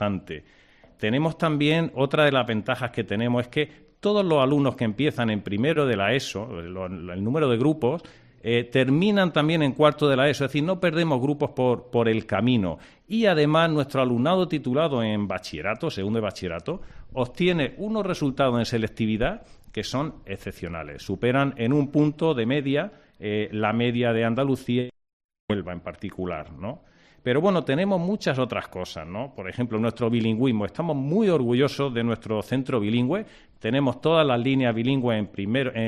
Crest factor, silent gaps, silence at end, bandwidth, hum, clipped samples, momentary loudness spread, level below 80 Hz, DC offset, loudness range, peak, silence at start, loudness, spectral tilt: 18 dB; 25.13-25.29 s, 25.40-25.48 s; 0 s; 13.5 kHz; none; under 0.1%; 13 LU; -52 dBFS; under 0.1%; 5 LU; -6 dBFS; 0 s; -24 LUFS; -7 dB/octave